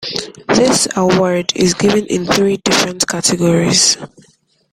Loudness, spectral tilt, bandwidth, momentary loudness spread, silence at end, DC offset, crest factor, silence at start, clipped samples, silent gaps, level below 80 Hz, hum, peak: -13 LUFS; -3.5 dB/octave; 16 kHz; 6 LU; 0.65 s; under 0.1%; 14 dB; 0 s; under 0.1%; none; -46 dBFS; none; 0 dBFS